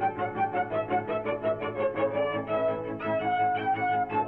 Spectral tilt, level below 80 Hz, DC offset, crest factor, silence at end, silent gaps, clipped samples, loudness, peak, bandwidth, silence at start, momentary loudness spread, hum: -9 dB/octave; -60 dBFS; under 0.1%; 12 dB; 0 s; none; under 0.1%; -29 LUFS; -16 dBFS; 4.6 kHz; 0 s; 3 LU; none